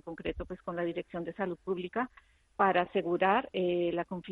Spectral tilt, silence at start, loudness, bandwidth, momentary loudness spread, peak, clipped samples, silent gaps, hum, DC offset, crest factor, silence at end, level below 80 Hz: -8 dB/octave; 0.05 s; -32 LUFS; 4.4 kHz; 11 LU; -12 dBFS; under 0.1%; none; none; under 0.1%; 20 dB; 0 s; -56 dBFS